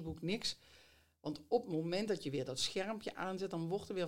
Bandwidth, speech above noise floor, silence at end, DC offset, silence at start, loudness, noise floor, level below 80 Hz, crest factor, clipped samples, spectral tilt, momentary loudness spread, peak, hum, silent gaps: 16.5 kHz; 27 dB; 0 s; under 0.1%; 0 s; -40 LUFS; -67 dBFS; -68 dBFS; 20 dB; under 0.1%; -4.5 dB/octave; 8 LU; -20 dBFS; none; none